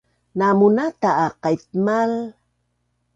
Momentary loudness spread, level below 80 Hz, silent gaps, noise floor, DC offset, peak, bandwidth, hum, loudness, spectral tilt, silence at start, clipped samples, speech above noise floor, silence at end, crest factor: 11 LU; -62 dBFS; none; -70 dBFS; under 0.1%; -4 dBFS; 7.8 kHz; 60 Hz at -55 dBFS; -19 LUFS; -7.5 dB/octave; 0.35 s; under 0.1%; 51 dB; 0.85 s; 16 dB